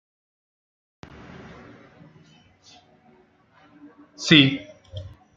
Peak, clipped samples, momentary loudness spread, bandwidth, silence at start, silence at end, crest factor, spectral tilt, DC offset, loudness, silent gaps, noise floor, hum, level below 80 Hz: -2 dBFS; under 0.1%; 29 LU; 7.8 kHz; 4.2 s; 0.3 s; 26 dB; -4.5 dB/octave; under 0.1%; -18 LUFS; none; -58 dBFS; none; -60 dBFS